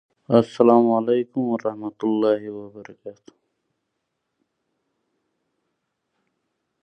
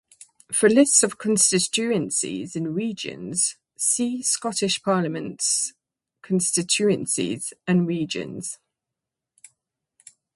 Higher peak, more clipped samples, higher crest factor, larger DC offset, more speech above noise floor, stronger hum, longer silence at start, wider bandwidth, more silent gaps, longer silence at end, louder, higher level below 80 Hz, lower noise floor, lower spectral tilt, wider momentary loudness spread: about the same, -2 dBFS vs -4 dBFS; neither; about the same, 22 dB vs 20 dB; neither; second, 57 dB vs 63 dB; neither; second, 0.3 s vs 0.5 s; second, 8.4 kHz vs 12 kHz; neither; first, 3.7 s vs 1.8 s; about the same, -20 LUFS vs -22 LUFS; about the same, -70 dBFS vs -68 dBFS; second, -78 dBFS vs -86 dBFS; first, -8.5 dB/octave vs -3 dB/octave; first, 24 LU vs 12 LU